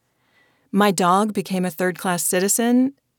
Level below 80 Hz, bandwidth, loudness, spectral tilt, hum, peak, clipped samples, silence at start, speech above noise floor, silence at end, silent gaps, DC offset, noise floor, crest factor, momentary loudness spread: -72 dBFS; over 20 kHz; -20 LUFS; -4 dB/octave; none; -4 dBFS; under 0.1%; 0.75 s; 43 dB; 0.25 s; none; under 0.1%; -62 dBFS; 16 dB; 6 LU